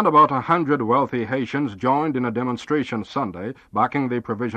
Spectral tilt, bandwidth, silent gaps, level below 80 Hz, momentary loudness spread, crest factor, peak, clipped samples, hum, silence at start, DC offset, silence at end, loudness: -7.5 dB/octave; 8.6 kHz; none; -60 dBFS; 9 LU; 16 dB; -4 dBFS; under 0.1%; none; 0 s; under 0.1%; 0 s; -22 LUFS